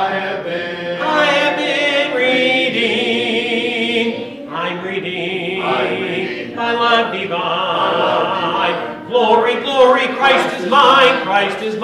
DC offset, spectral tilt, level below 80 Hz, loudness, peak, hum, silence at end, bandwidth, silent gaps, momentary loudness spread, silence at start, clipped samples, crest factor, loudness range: under 0.1%; -4 dB/octave; -62 dBFS; -15 LUFS; -2 dBFS; none; 0 s; 12.5 kHz; none; 10 LU; 0 s; under 0.1%; 14 dB; 5 LU